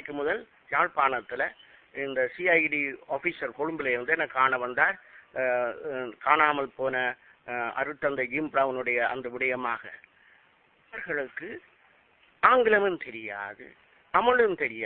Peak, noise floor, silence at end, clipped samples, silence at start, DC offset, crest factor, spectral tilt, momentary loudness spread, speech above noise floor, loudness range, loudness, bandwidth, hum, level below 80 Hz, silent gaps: -6 dBFS; -63 dBFS; 0 s; under 0.1%; 0 s; under 0.1%; 22 dB; -8.5 dB/octave; 14 LU; 36 dB; 4 LU; -27 LUFS; 4.4 kHz; none; -66 dBFS; none